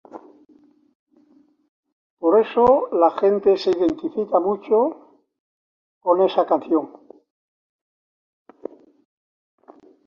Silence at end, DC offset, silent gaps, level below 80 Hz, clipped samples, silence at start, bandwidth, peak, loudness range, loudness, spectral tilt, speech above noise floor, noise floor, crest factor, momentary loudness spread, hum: 3.2 s; under 0.1%; 0.95-1.06 s, 1.69-1.83 s, 1.92-2.17 s, 5.40-6.01 s; -60 dBFS; under 0.1%; 0.15 s; 6.8 kHz; -4 dBFS; 6 LU; -19 LUFS; -7 dB/octave; 39 dB; -57 dBFS; 20 dB; 17 LU; none